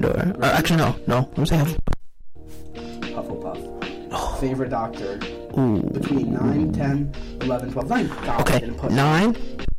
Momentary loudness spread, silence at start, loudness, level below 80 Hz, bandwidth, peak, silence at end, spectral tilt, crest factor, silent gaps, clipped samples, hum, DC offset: 13 LU; 0 s; -23 LUFS; -34 dBFS; 16.5 kHz; -6 dBFS; 0 s; -6.5 dB/octave; 16 dB; none; under 0.1%; none; under 0.1%